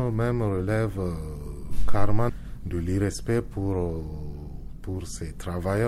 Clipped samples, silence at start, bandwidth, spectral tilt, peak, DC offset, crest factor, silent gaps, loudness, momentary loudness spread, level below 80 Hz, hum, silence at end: under 0.1%; 0 s; 13 kHz; -7 dB/octave; -6 dBFS; under 0.1%; 16 dB; none; -29 LUFS; 12 LU; -36 dBFS; none; 0 s